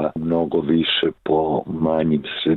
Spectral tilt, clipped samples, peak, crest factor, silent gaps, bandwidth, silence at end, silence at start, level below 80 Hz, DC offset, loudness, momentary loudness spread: -9 dB/octave; under 0.1%; -8 dBFS; 12 dB; none; 4.4 kHz; 0 s; 0 s; -48 dBFS; under 0.1%; -20 LUFS; 4 LU